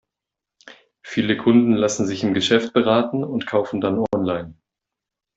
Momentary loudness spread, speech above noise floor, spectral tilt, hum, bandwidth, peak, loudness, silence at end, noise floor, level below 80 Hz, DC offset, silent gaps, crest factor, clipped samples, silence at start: 9 LU; 67 dB; -5 dB/octave; none; 8 kHz; -2 dBFS; -20 LUFS; 0.85 s; -86 dBFS; -60 dBFS; under 0.1%; none; 18 dB; under 0.1%; 0.65 s